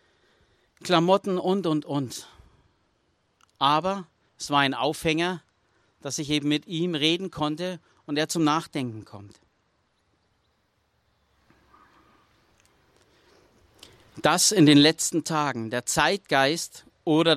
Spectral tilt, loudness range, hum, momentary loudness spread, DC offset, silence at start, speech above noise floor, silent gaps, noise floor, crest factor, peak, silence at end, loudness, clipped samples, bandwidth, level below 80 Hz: -4 dB/octave; 9 LU; none; 16 LU; under 0.1%; 0.8 s; 46 dB; none; -70 dBFS; 22 dB; -6 dBFS; 0 s; -24 LUFS; under 0.1%; 15 kHz; -62 dBFS